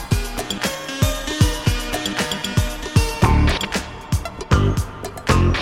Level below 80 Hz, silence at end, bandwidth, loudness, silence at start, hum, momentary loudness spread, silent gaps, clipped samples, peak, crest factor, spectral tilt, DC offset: -26 dBFS; 0 s; 17 kHz; -21 LUFS; 0 s; none; 8 LU; none; under 0.1%; 0 dBFS; 18 dB; -5 dB/octave; under 0.1%